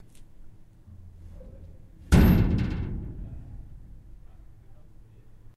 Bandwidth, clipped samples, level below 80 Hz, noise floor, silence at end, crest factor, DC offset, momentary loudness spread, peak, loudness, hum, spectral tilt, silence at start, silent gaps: 14.5 kHz; under 0.1%; -32 dBFS; -49 dBFS; 0.85 s; 22 dB; under 0.1%; 29 LU; -6 dBFS; -24 LUFS; none; -7.5 dB/octave; 0.15 s; none